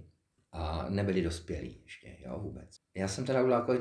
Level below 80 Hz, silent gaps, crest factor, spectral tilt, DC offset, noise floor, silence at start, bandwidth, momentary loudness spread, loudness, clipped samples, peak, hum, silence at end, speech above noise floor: -50 dBFS; none; 20 dB; -6 dB/octave; under 0.1%; -65 dBFS; 0 s; 11 kHz; 20 LU; -34 LUFS; under 0.1%; -14 dBFS; none; 0 s; 32 dB